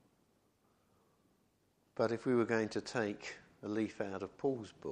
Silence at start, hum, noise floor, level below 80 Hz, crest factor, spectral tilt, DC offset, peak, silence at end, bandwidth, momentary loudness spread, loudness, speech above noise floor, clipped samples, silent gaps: 1.95 s; none; -75 dBFS; -76 dBFS; 20 dB; -6 dB/octave; under 0.1%; -18 dBFS; 0 s; 10 kHz; 14 LU; -38 LUFS; 38 dB; under 0.1%; none